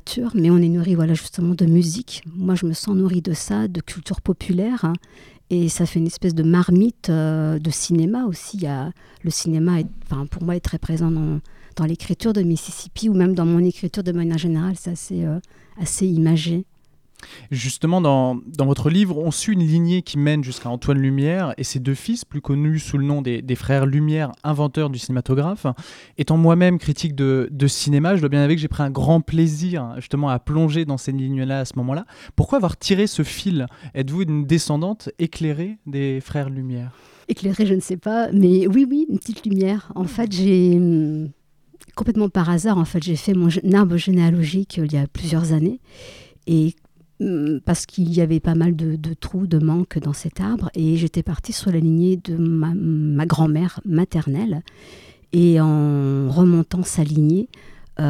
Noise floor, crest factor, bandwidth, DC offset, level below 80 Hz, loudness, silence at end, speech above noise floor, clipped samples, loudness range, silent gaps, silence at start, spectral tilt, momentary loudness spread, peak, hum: -52 dBFS; 16 dB; 14 kHz; under 0.1%; -42 dBFS; -20 LUFS; 0 s; 32 dB; under 0.1%; 4 LU; none; 0.05 s; -6.5 dB/octave; 10 LU; -2 dBFS; none